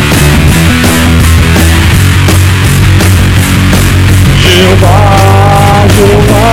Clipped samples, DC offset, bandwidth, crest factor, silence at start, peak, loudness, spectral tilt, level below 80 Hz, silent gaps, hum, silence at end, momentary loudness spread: 9%; under 0.1%; 16.5 kHz; 4 dB; 0 s; 0 dBFS; -5 LUFS; -5 dB/octave; -14 dBFS; none; none; 0 s; 2 LU